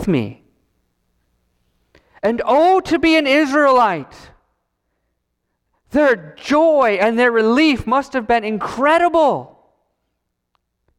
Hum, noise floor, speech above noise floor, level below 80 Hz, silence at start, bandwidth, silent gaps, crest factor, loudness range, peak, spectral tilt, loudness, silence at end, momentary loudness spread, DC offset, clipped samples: none; -74 dBFS; 59 dB; -48 dBFS; 0 s; 13 kHz; none; 14 dB; 4 LU; -4 dBFS; -5.5 dB/octave; -15 LUFS; 1.55 s; 9 LU; under 0.1%; under 0.1%